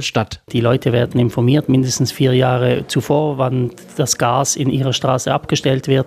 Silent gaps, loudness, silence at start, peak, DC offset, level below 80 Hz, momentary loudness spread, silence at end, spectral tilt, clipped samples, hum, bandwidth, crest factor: none; -16 LUFS; 0 s; -2 dBFS; under 0.1%; -48 dBFS; 5 LU; 0 s; -5 dB/octave; under 0.1%; none; 15 kHz; 14 dB